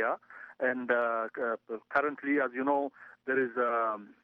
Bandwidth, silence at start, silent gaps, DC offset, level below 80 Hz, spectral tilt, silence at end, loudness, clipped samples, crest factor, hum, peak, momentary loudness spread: 5.4 kHz; 0 s; none; under 0.1%; -80 dBFS; -7.5 dB/octave; 0.1 s; -31 LUFS; under 0.1%; 18 dB; none; -14 dBFS; 9 LU